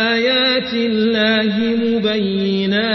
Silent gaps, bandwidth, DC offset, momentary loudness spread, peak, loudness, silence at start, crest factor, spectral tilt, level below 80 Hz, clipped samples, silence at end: none; 6.2 kHz; under 0.1%; 4 LU; -4 dBFS; -16 LUFS; 0 s; 12 dB; -6.5 dB/octave; -52 dBFS; under 0.1%; 0 s